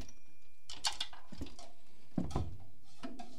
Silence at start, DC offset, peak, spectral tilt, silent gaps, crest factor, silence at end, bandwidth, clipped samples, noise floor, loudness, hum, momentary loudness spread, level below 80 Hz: 0 s; 2%; -20 dBFS; -3.5 dB/octave; none; 24 dB; 0 s; 16 kHz; under 0.1%; -64 dBFS; -42 LUFS; none; 20 LU; -54 dBFS